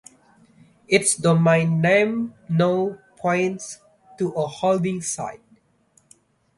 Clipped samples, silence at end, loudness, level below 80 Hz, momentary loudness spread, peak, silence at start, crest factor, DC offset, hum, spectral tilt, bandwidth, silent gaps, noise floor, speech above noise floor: under 0.1%; 1.2 s; -21 LUFS; -62 dBFS; 12 LU; -4 dBFS; 0.9 s; 18 dB; under 0.1%; none; -5 dB/octave; 11.5 kHz; none; -61 dBFS; 41 dB